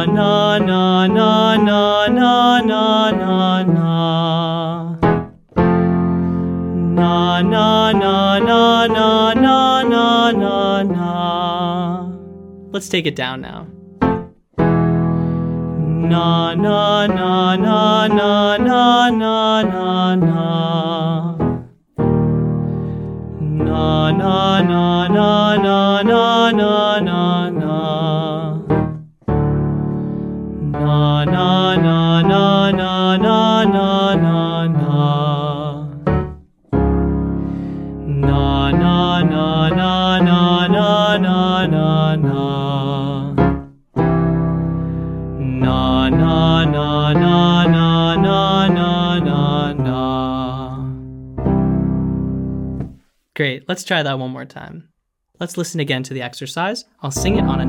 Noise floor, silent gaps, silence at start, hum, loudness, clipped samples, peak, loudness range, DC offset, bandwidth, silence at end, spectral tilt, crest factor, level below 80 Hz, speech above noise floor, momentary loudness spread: -41 dBFS; none; 0 s; none; -15 LUFS; under 0.1%; 0 dBFS; 7 LU; under 0.1%; 10.5 kHz; 0 s; -6.5 dB/octave; 14 dB; -34 dBFS; 27 dB; 11 LU